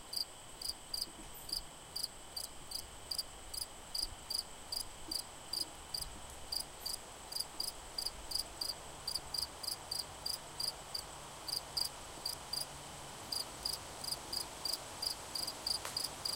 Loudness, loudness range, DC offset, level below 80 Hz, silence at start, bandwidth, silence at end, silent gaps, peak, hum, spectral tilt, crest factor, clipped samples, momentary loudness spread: -40 LUFS; 2 LU; under 0.1%; -60 dBFS; 0 s; 17 kHz; 0 s; none; -22 dBFS; none; -0.5 dB/octave; 20 dB; under 0.1%; 6 LU